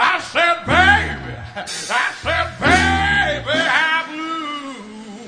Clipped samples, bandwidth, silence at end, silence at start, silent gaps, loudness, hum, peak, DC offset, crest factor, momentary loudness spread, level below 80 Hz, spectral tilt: under 0.1%; 10.5 kHz; 0 s; 0 s; none; -17 LUFS; none; 0 dBFS; under 0.1%; 18 dB; 16 LU; -36 dBFS; -3.5 dB/octave